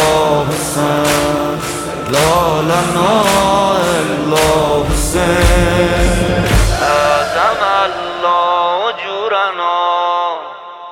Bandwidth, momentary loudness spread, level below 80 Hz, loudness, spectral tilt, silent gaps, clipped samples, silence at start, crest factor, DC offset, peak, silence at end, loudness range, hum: 17 kHz; 6 LU; -24 dBFS; -13 LUFS; -4.5 dB/octave; none; under 0.1%; 0 s; 12 dB; under 0.1%; 0 dBFS; 0 s; 2 LU; none